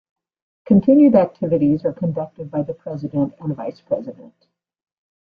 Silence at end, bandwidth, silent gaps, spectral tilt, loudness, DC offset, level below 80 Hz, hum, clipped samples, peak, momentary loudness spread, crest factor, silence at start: 1.2 s; 4.9 kHz; none; -12 dB/octave; -19 LUFS; under 0.1%; -56 dBFS; none; under 0.1%; -2 dBFS; 16 LU; 16 dB; 0.7 s